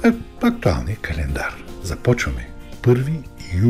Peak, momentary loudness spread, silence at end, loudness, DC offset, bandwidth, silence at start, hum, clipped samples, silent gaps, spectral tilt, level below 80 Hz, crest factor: -4 dBFS; 11 LU; 0 s; -22 LUFS; under 0.1%; 15 kHz; 0 s; none; under 0.1%; none; -7 dB/octave; -32 dBFS; 16 dB